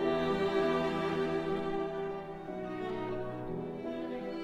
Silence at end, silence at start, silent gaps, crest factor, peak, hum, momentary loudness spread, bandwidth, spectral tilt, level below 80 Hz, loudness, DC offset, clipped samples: 0 s; 0 s; none; 16 dB; -18 dBFS; none; 9 LU; 9.4 kHz; -7 dB/octave; -56 dBFS; -35 LUFS; under 0.1%; under 0.1%